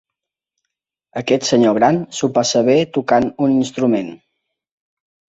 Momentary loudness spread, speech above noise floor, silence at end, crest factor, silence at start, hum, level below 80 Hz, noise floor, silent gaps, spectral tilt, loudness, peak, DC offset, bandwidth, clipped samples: 8 LU; 68 dB; 1.25 s; 16 dB; 1.15 s; none; -56 dBFS; -83 dBFS; none; -5 dB/octave; -16 LUFS; -2 dBFS; under 0.1%; 8 kHz; under 0.1%